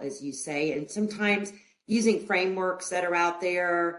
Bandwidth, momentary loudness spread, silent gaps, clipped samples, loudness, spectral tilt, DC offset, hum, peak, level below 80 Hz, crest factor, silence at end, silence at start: 11.5 kHz; 7 LU; none; under 0.1%; -27 LUFS; -4 dB/octave; under 0.1%; none; -12 dBFS; -72 dBFS; 16 dB; 0 s; 0 s